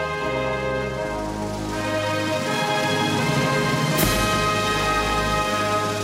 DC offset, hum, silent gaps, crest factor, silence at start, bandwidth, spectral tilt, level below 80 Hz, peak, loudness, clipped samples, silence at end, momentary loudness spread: under 0.1%; none; none; 18 dB; 0 s; 16 kHz; -4 dB/octave; -38 dBFS; -4 dBFS; -22 LUFS; under 0.1%; 0 s; 7 LU